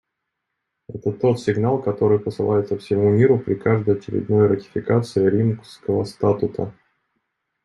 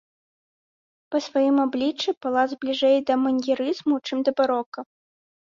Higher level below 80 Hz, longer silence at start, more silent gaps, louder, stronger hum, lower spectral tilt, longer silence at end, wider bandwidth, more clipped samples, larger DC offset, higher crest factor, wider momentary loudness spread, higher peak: first, -58 dBFS vs -70 dBFS; second, 0.9 s vs 1.1 s; second, none vs 2.17-2.21 s, 4.66-4.72 s; first, -20 LUFS vs -23 LUFS; neither; first, -8.5 dB/octave vs -4 dB/octave; first, 0.95 s vs 0.75 s; first, 11.5 kHz vs 7.4 kHz; neither; neither; about the same, 16 dB vs 16 dB; about the same, 8 LU vs 8 LU; first, -4 dBFS vs -8 dBFS